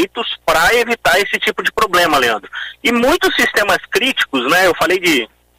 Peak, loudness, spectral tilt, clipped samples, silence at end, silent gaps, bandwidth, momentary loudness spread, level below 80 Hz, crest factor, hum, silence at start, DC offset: 0 dBFS; -14 LUFS; -2.5 dB/octave; under 0.1%; 0.35 s; none; 16 kHz; 5 LU; -42 dBFS; 14 dB; none; 0 s; under 0.1%